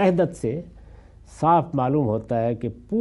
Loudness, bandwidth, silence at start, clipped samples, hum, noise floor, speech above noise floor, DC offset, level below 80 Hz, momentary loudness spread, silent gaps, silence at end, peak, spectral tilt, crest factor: -23 LUFS; 11.5 kHz; 0 s; under 0.1%; none; -46 dBFS; 24 dB; under 0.1%; -50 dBFS; 10 LU; none; 0 s; -6 dBFS; -8.5 dB/octave; 16 dB